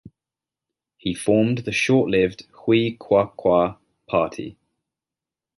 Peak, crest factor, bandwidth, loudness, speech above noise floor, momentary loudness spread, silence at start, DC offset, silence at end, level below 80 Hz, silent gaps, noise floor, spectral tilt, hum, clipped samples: -4 dBFS; 18 dB; 11.5 kHz; -21 LUFS; 69 dB; 11 LU; 0.05 s; under 0.1%; 1.05 s; -54 dBFS; none; -89 dBFS; -6 dB/octave; none; under 0.1%